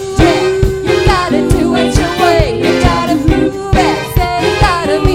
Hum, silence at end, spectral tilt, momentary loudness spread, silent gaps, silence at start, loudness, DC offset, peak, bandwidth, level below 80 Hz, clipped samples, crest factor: none; 0 s; -5.5 dB/octave; 3 LU; none; 0 s; -11 LUFS; under 0.1%; 0 dBFS; 17 kHz; -20 dBFS; 0.4%; 10 dB